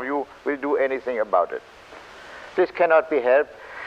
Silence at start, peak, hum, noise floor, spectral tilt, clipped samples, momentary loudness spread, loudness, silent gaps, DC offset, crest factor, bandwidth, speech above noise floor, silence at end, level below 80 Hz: 0 s; -6 dBFS; none; -42 dBFS; -5.5 dB/octave; under 0.1%; 22 LU; -22 LUFS; none; under 0.1%; 16 dB; 8.4 kHz; 21 dB; 0 s; -62 dBFS